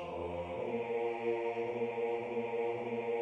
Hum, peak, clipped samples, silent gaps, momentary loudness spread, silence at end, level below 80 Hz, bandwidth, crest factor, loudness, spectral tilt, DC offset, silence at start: none; -24 dBFS; under 0.1%; none; 4 LU; 0 s; -66 dBFS; 7.6 kHz; 14 dB; -37 LUFS; -7 dB/octave; under 0.1%; 0 s